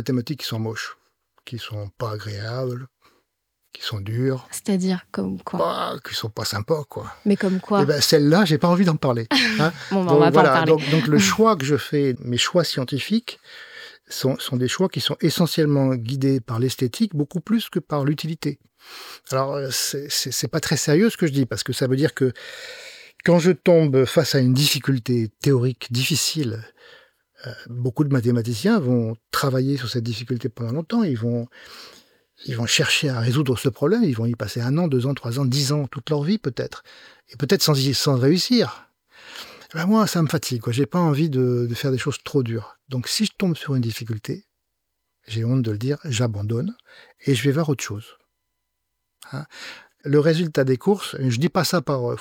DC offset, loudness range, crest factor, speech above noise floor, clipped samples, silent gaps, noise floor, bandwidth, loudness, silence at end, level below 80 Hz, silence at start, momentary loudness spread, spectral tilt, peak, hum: under 0.1%; 8 LU; 20 dB; 57 dB; under 0.1%; none; -78 dBFS; 19 kHz; -21 LUFS; 0 s; -60 dBFS; 0 s; 16 LU; -5 dB/octave; 0 dBFS; none